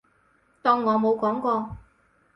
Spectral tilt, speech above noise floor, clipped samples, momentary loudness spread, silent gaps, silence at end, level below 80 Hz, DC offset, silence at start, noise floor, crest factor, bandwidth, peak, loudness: -8 dB/octave; 41 dB; under 0.1%; 13 LU; none; 0.55 s; -56 dBFS; under 0.1%; 0.65 s; -64 dBFS; 18 dB; 6 kHz; -8 dBFS; -24 LUFS